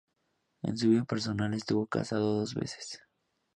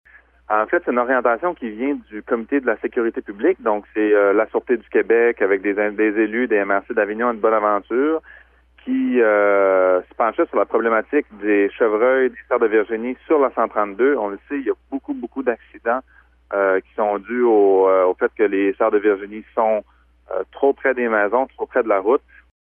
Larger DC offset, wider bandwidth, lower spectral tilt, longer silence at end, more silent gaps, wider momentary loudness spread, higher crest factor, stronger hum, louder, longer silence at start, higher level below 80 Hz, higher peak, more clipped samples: neither; first, 10.5 kHz vs 3.5 kHz; second, -6 dB/octave vs -9 dB/octave; first, 0.6 s vs 0.45 s; neither; first, 13 LU vs 9 LU; about the same, 18 dB vs 16 dB; neither; second, -31 LUFS vs -19 LUFS; first, 0.65 s vs 0.5 s; second, -64 dBFS vs -56 dBFS; second, -14 dBFS vs -4 dBFS; neither